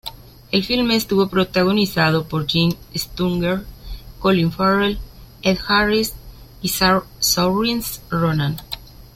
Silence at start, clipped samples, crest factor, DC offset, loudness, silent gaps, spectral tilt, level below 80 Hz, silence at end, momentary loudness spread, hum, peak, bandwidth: 0.05 s; under 0.1%; 16 dB; under 0.1%; -19 LUFS; none; -4.5 dB/octave; -40 dBFS; 0.1 s; 11 LU; none; -2 dBFS; 16.5 kHz